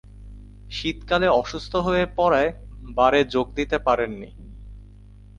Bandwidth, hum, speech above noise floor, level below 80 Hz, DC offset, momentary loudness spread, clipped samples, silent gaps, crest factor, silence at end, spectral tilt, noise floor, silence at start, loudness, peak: 10.5 kHz; 50 Hz at -40 dBFS; 24 dB; -40 dBFS; under 0.1%; 16 LU; under 0.1%; none; 18 dB; 0.55 s; -5.5 dB/octave; -45 dBFS; 0.15 s; -22 LUFS; -6 dBFS